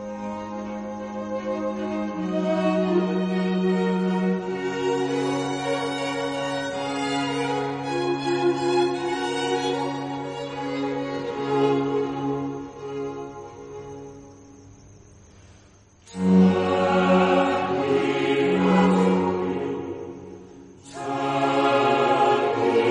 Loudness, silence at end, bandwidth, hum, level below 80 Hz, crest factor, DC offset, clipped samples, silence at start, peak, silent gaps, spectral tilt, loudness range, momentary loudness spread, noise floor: -24 LUFS; 0 s; 10.5 kHz; none; -60 dBFS; 18 dB; under 0.1%; under 0.1%; 0 s; -6 dBFS; none; -6.5 dB/octave; 7 LU; 14 LU; -53 dBFS